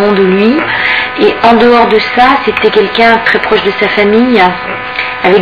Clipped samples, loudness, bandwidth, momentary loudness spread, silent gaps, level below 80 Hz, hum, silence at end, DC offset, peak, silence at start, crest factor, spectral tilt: 2%; -8 LUFS; 5.4 kHz; 4 LU; none; -40 dBFS; none; 0 s; 0.6%; 0 dBFS; 0 s; 8 dB; -6.5 dB/octave